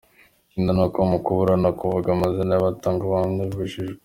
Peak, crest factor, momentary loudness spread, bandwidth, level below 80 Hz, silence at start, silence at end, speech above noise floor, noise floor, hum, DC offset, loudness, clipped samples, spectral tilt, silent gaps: -4 dBFS; 18 dB; 7 LU; 16 kHz; -48 dBFS; 0.55 s; 0.1 s; 36 dB; -57 dBFS; none; under 0.1%; -22 LUFS; under 0.1%; -8.5 dB/octave; none